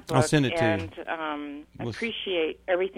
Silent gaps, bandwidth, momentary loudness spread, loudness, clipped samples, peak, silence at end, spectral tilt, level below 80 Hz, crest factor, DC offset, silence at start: none; 16 kHz; 13 LU; -27 LUFS; under 0.1%; -6 dBFS; 0 s; -5.5 dB/octave; -54 dBFS; 22 dB; under 0.1%; 0.05 s